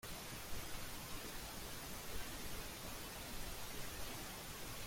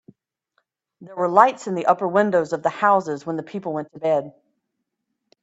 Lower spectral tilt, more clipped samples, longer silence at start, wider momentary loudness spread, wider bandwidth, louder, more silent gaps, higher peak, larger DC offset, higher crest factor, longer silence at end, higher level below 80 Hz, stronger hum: second, -2.5 dB/octave vs -6 dB/octave; neither; second, 0.05 s vs 1 s; second, 1 LU vs 12 LU; first, 16.5 kHz vs 8 kHz; second, -48 LUFS vs -21 LUFS; neither; second, -30 dBFS vs 0 dBFS; neither; second, 16 dB vs 22 dB; second, 0 s vs 1.1 s; first, -56 dBFS vs -70 dBFS; neither